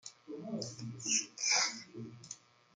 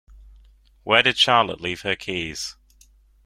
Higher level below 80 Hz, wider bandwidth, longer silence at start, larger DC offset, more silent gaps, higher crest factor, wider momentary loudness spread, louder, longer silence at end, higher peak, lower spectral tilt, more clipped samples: second, -82 dBFS vs -52 dBFS; second, 11.5 kHz vs 16 kHz; second, 0.05 s vs 0.85 s; neither; neither; about the same, 22 dB vs 22 dB; first, 20 LU vs 16 LU; second, -34 LUFS vs -20 LUFS; second, 0.4 s vs 0.75 s; second, -18 dBFS vs -2 dBFS; second, -1 dB/octave vs -2.5 dB/octave; neither